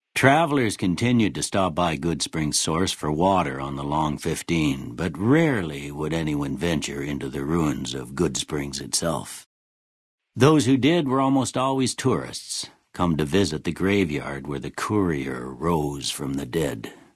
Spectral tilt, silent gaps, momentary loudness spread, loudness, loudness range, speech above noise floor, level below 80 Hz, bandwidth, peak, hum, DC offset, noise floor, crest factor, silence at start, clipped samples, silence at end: -5 dB/octave; 9.46-10.18 s; 10 LU; -24 LUFS; 4 LU; over 67 dB; -48 dBFS; 12 kHz; -2 dBFS; none; under 0.1%; under -90 dBFS; 22 dB; 0.15 s; under 0.1%; 0.2 s